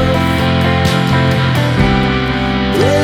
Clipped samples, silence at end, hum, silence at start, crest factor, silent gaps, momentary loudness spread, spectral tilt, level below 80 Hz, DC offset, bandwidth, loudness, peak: under 0.1%; 0 s; none; 0 s; 12 dB; none; 2 LU; -6 dB/octave; -26 dBFS; under 0.1%; 15.5 kHz; -13 LUFS; 0 dBFS